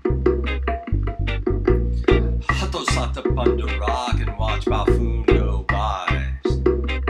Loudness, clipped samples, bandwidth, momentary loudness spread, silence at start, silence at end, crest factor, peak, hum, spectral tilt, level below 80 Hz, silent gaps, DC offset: -22 LUFS; under 0.1%; 10.5 kHz; 5 LU; 0.05 s; 0 s; 18 dB; -2 dBFS; none; -6.5 dB/octave; -24 dBFS; none; under 0.1%